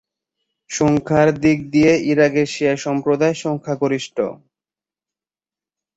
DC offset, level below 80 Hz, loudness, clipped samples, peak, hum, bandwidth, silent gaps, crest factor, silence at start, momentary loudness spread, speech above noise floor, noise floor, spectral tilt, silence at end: under 0.1%; -52 dBFS; -18 LUFS; under 0.1%; -2 dBFS; none; 8 kHz; none; 18 dB; 0.7 s; 9 LU; over 73 dB; under -90 dBFS; -6 dB/octave; 1.6 s